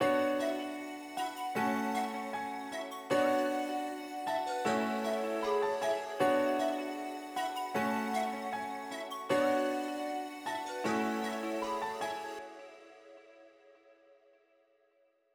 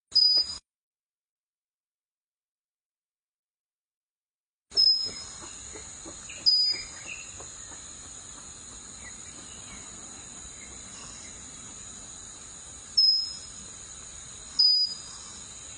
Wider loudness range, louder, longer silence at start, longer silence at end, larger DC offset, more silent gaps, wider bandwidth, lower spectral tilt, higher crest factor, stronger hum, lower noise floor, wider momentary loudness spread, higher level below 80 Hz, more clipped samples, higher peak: second, 7 LU vs 15 LU; second, -34 LUFS vs -22 LUFS; about the same, 0 s vs 0.1 s; first, 1.65 s vs 0 s; neither; second, none vs 0.75-4.66 s; first, over 20 kHz vs 10 kHz; first, -4 dB/octave vs 0.5 dB/octave; about the same, 18 dB vs 22 dB; neither; second, -72 dBFS vs under -90 dBFS; second, 10 LU vs 21 LU; second, -78 dBFS vs -60 dBFS; neither; second, -18 dBFS vs -10 dBFS